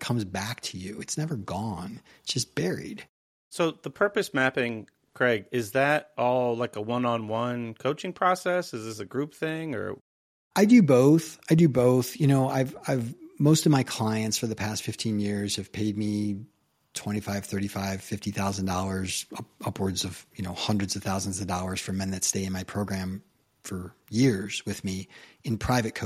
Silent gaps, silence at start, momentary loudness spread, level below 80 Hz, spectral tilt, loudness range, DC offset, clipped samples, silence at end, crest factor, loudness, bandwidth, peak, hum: 3.09-3.51 s, 10.01-10.51 s; 0 s; 14 LU; -58 dBFS; -5 dB/octave; 9 LU; under 0.1%; under 0.1%; 0 s; 20 dB; -27 LUFS; 16 kHz; -8 dBFS; none